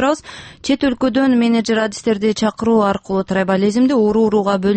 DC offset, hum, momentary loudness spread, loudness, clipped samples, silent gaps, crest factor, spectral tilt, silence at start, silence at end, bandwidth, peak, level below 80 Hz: under 0.1%; none; 6 LU; -16 LUFS; under 0.1%; none; 12 dB; -5.5 dB/octave; 0 s; 0 s; 8.8 kHz; -4 dBFS; -48 dBFS